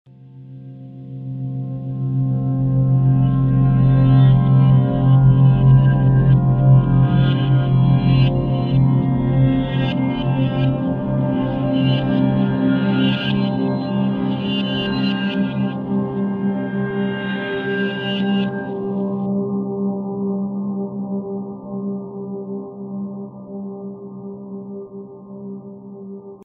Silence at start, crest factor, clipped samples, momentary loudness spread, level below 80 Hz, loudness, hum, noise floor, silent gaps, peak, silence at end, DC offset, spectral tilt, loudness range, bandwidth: 0.2 s; 14 dB; under 0.1%; 19 LU; -38 dBFS; -18 LUFS; none; -39 dBFS; none; -2 dBFS; 0 s; under 0.1%; -10.5 dB/octave; 15 LU; 4.3 kHz